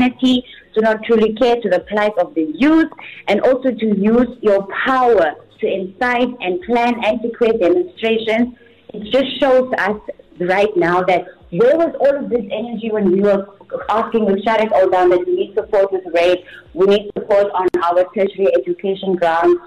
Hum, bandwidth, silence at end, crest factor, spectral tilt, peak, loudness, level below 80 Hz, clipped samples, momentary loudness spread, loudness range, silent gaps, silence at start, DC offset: none; 11 kHz; 0 s; 10 dB; -6.5 dB/octave; -6 dBFS; -16 LUFS; -50 dBFS; under 0.1%; 8 LU; 2 LU; none; 0 s; under 0.1%